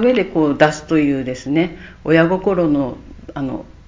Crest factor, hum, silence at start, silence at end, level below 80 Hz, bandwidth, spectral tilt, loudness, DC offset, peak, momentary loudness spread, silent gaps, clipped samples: 16 dB; none; 0 s; 0.2 s; -44 dBFS; 7.6 kHz; -6.5 dB/octave; -17 LUFS; under 0.1%; 0 dBFS; 12 LU; none; under 0.1%